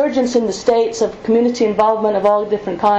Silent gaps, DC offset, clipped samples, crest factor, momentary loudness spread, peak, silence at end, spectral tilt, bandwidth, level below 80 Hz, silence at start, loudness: none; under 0.1%; under 0.1%; 12 dB; 3 LU; -4 dBFS; 0 s; -5 dB/octave; 8.2 kHz; -50 dBFS; 0 s; -16 LUFS